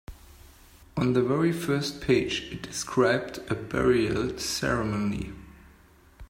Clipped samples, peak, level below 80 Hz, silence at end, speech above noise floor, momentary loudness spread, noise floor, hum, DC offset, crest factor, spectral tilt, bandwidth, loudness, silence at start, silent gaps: under 0.1%; -10 dBFS; -48 dBFS; 0.05 s; 29 dB; 10 LU; -56 dBFS; none; under 0.1%; 18 dB; -5 dB/octave; 16 kHz; -27 LUFS; 0.1 s; none